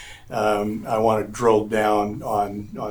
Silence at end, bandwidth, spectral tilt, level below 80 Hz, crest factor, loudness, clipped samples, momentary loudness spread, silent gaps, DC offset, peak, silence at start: 0 s; over 20 kHz; -6 dB/octave; -48 dBFS; 18 dB; -22 LUFS; under 0.1%; 7 LU; none; under 0.1%; -4 dBFS; 0 s